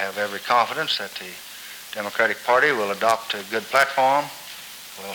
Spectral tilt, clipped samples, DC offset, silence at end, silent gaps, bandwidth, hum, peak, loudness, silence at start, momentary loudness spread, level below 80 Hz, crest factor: -2 dB/octave; under 0.1%; under 0.1%; 0 s; none; over 20 kHz; none; -6 dBFS; -21 LUFS; 0 s; 18 LU; -70 dBFS; 18 dB